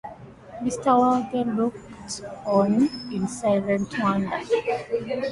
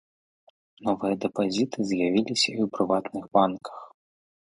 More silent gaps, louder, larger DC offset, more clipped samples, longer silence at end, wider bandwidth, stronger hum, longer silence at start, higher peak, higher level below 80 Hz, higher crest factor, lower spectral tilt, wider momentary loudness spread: neither; about the same, -24 LUFS vs -26 LUFS; neither; neither; second, 0 s vs 0.55 s; about the same, 11.5 kHz vs 11.5 kHz; neither; second, 0.05 s vs 0.8 s; about the same, -6 dBFS vs -6 dBFS; first, -56 dBFS vs -66 dBFS; about the same, 18 dB vs 22 dB; first, -6 dB/octave vs -4.5 dB/octave; first, 14 LU vs 9 LU